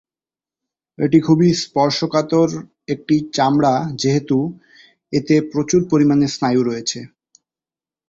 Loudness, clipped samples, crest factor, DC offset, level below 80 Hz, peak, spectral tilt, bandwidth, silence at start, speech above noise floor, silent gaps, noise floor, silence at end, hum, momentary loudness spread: -17 LUFS; under 0.1%; 16 dB; under 0.1%; -54 dBFS; -2 dBFS; -6 dB/octave; 7.8 kHz; 1 s; over 74 dB; none; under -90 dBFS; 1 s; none; 9 LU